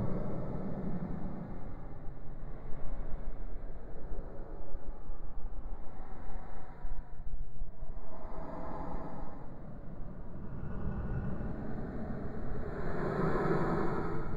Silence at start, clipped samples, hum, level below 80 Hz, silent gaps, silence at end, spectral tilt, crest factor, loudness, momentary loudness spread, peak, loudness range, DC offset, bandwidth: 0 s; under 0.1%; none; -40 dBFS; none; 0 s; -9.5 dB/octave; 12 dB; -41 LUFS; 15 LU; -18 dBFS; 12 LU; under 0.1%; 4.5 kHz